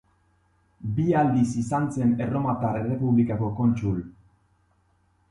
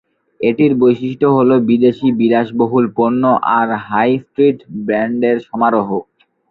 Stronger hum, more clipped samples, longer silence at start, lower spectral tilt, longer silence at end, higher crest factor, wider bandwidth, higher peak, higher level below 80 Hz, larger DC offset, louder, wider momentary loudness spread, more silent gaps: neither; neither; first, 0.8 s vs 0.4 s; about the same, -8.5 dB/octave vs -9.5 dB/octave; first, 1.2 s vs 0.5 s; about the same, 16 dB vs 12 dB; first, 11 kHz vs 4.6 kHz; second, -10 dBFS vs -2 dBFS; about the same, -52 dBFS vs -56 dBFS; neither; second, -25 LUFS vs -14 LUFS; about the same, 8 LU vs 6 LU; neither